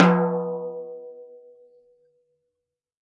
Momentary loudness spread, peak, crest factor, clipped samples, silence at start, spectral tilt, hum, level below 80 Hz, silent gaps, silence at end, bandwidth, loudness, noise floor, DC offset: 24 LU; 0 dBFS; 26 dB; under 0.1%; 0 s; -8 dB/octave; none; -74 dBFS; none; 1.7 s; 7 kHz; -25 LUFS; -84 dBFS; under 0.1%